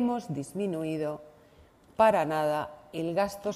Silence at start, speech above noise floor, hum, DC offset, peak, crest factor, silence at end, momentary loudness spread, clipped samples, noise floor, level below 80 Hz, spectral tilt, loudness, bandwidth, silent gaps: 0 s; 29 dB; none; under 0.1%; -10 dBFS; 20 dB; 0 s; 13 LU; under 0.1%; -58 dBFS; -64 dBFS; -6 dB/octave; -29 LUFS; 15 kHz; none